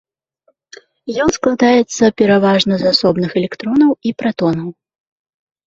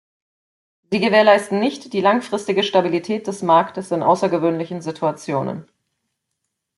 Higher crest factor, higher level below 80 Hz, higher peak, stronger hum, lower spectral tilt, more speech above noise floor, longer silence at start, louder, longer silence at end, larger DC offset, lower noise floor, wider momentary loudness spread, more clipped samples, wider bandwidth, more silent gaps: about the same, 14 dB vs 18 dB; first, -48 dBFS vs -66 dBFS; about the same, 0 dBFS vs -2 dBFS; neither; about the same, -5 dB/octave vs -5.5 dB/octave; second, 48 dB vs 59 dB; first, 1.05 s vs 0.9 s; first, -14 LUFS vs -19 LUFS; second, 0.95 s vs 1.15 s; neither; second, -61 dBFS vs -77 dBFS; second, 8 LU vs 11 LU; neither; second, 8 kHz vs 12 kHz; neither